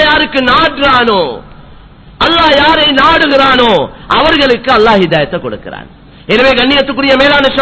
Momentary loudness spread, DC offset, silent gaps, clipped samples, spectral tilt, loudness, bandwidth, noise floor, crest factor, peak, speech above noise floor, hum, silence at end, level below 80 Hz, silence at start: 11 LU; under 0.1%; none; 1%; -5 dB/octave; -8 LUFS; 8 kHz; -34 dBFS; 8 dB; 0 dBFS; 26 dB; none; 0 s; -32 dBFS; 0 s